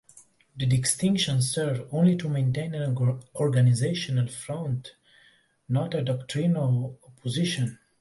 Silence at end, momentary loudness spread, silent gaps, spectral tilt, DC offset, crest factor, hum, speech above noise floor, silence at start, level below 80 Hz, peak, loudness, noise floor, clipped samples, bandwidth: 0.25 s; 9 LU; none; -5.5 dB/octave; under 0.1%; 16 dB; none; 36 dB; 0.15 s; -60 dBFS; -10 dBFS; -26 LUFS; -61 dBFS; under 0.1%; 11.5 kHz